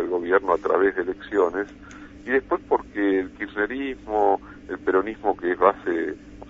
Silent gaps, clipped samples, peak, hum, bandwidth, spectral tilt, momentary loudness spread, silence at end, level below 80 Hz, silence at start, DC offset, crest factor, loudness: none; under 0.1%; -4 dBFS; none; 7.2 kHz; -6.5 dB/octave; 10 LU; 0 s; -52 dBFS; 0 s; under 0.1%; 20 dB; -24 LUFS